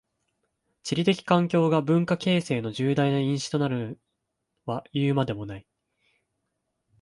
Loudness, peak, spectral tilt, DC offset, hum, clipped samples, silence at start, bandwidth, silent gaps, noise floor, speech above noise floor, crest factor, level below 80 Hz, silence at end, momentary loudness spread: -25 LUFS; -6 dBFS; -6.5 dB/octave; under 0.1%; none; under 0.1%; 0.85 s; 11.5 kHz; none; -80 dBFS; 56 dB; 20 dB; -62 dBFS; 1.4 s; 16 LU